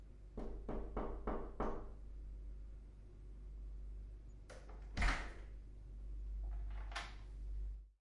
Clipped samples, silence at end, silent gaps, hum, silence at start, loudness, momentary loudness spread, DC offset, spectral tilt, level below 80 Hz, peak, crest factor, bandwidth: under 0.1%; 0.1 s; none; none; 0 s; -49 LUFS; 13 LU; under 0.1%; -5.5 dB/octave; -48 dBFS; -26 dBFS; 20 dB; 11 kHz